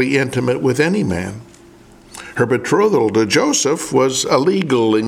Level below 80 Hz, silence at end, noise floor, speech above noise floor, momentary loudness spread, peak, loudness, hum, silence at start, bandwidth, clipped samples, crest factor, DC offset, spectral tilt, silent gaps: -50 dBFS; 0 s; -44 dBFS; 28 dB; 9 LU; -2 dBFS; -16 LUFS; none; 0 s; 15.5 kHz; under 0.1%; 16 dB; under 0.1%; -4.5 dB/octave; none